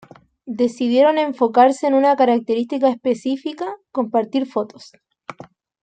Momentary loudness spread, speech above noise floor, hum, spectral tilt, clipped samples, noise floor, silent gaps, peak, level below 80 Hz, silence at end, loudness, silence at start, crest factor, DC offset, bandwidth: 17 LU; 26 dB; none; -5.5 dB/octave; under 0.1%; -44 dBFS; none; -2 dBFS; -70 dBFS; 0.5 s; -18 LUFS; 0.45 s; 16 dB; under 0.1%; 9.2 kHz